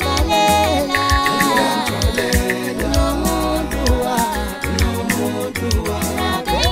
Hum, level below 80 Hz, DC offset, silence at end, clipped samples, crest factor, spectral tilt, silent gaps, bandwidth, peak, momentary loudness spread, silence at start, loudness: none; -24 dBFS; under 0.1%; 0 s; under 0.1%; 16 dB; -4 dB/octave; none; 16.5 kHz; 0 dBFS; 6 LU; 0 s; -18 LUFS